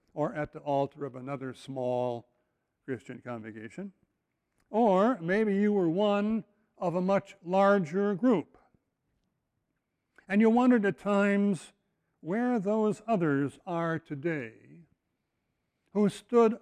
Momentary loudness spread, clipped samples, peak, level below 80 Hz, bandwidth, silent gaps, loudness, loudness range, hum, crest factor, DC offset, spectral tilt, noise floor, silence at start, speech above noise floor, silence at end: 16 LU; under 0.1%; -14 dBFS; -70 dBFS; 10.5 kHz; none; -29 LUFS; 8 LU; none; 16 dB; under 0.1%; -7.5 dB/octave; -81 dBFS; 0.15 s; 53 dB; 0.05 s